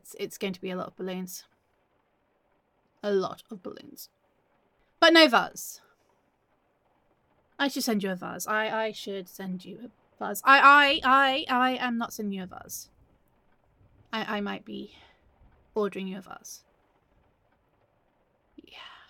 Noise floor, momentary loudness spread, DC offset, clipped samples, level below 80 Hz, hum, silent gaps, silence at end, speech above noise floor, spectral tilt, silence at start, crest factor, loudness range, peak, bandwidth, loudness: -71 dBFS; 25 LU; under 0.1%; under 0.1%; -68 dBFS; none; none; 0.2 s; 45 dB; -3 dB/octave; 0.05 s; 24 dB; 16 LU; -4 dBFS; 17.5 kHz; -24 LUFS